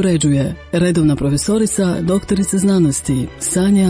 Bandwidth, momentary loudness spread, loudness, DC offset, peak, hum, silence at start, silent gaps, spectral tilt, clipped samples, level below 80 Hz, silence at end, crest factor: 10.5 kHz; 5 LU; -16 LUFS; under 0.1%; -4 dBFS; none; 0 s; none; -5.5 dB/octave; under 0.1%; -36 dBFS; 0 s; 10 dB